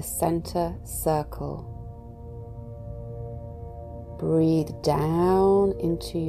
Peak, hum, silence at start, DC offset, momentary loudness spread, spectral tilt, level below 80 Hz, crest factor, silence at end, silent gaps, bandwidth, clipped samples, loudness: -10 dBFS; none; 0 s; under 0.1%; 19 LU; -6.5 dB/octave; -42 dBFS; 16 dB; 0 s; none; 16 kHz; under 0.1%; -25 LUFS